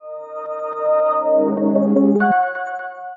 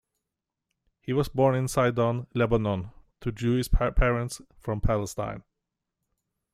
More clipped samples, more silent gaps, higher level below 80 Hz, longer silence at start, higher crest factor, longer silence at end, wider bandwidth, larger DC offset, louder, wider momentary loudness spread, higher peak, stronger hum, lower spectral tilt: neither; neither; second, -68 dBFS vs -34 dBFS; second, 0.05 s vs 1.05 s; about the same, 16 dB vs 18 dB; second, 0 s vs 1.15 s; second, 3.9 kHz vs 15 kHz; neither; first, -18 LUFS vs -27 LUFS; about the same, 14 LU vs 12 LU; first, -4 dBFS vs -10 dBFS; neither; first, -10 dB/octave vs -6.5 dB/octave